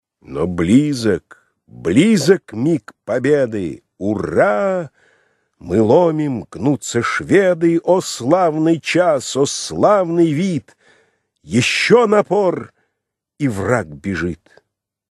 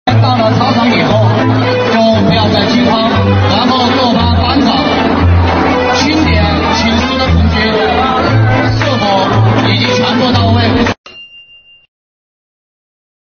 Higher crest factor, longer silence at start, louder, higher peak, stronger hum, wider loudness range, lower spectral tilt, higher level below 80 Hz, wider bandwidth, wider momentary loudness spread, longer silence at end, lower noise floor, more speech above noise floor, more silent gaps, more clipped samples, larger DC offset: first, 16 dB vs 10 dB; first, 0.3 s vs 0.05 s; second, -16 LUFS vs -10 LUFS; about the same, 0 dBFS vs 0 dBFS; neither; about the same, 3 LU vs 3 LU; about the same, -5.5 dB/octave vs -6 dB/octave; second, -50 dBFS vs -26 dBFS; first, 13 kHz vs 6.8 kHz; first, 11 LU vs 2 LU; second, 0.8 s vs 1.85 s; first, -78 dBFS vs -40 dBFS; first, 62 dB vs 31 dB; second, none vs 10.98-11.04 s; neither; neither